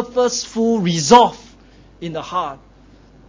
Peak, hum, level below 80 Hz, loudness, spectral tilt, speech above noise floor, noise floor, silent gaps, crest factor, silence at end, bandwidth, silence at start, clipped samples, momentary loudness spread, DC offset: 0 dBFS; none; -50 dBFS; -16 LUFS; -4.5 dB/octave; 30 dB; -47 dBFS; none; 18 dB; 0.75 s; 8 kHz; 0 s; under 0.1%; 18 LU; under 0.1%